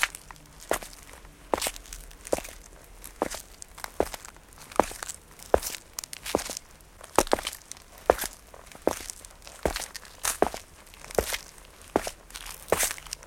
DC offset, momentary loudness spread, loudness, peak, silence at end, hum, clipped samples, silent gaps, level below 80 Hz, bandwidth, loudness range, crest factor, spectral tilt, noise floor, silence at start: under 0.1%; 20 LU; -31 LUFS; -2 dBFS; 0 s; none; under 0.1%; none; -48 dBFS; 17 kHz; 4 LU; 30 dB; -2.5 dB/octave; -50 dBFS; 0 s